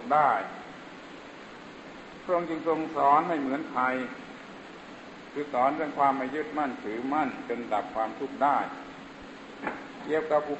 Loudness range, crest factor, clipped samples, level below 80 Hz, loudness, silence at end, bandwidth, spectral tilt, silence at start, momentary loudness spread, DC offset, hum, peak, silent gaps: 2 LU; 20 dB; under 0.1%; -68 dBFS; -29 LUFS; 0 s; 8.4 kHz; -6 dB/octave; 0 s; 20 LU; under 0.1%; none; -10 dBFS; none